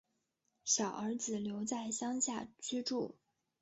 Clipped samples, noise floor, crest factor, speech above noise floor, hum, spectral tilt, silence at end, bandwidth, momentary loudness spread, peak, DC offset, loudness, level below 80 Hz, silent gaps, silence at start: under 0.1%; -83 dBFS; 20 dB; 45 dB; none; -4 dB/octave; 0.5 s; 8 kHz; 8 LU; -18 dBFS; under 0.1%; -38 LUFS; -78 dBFS; none; 0.65 s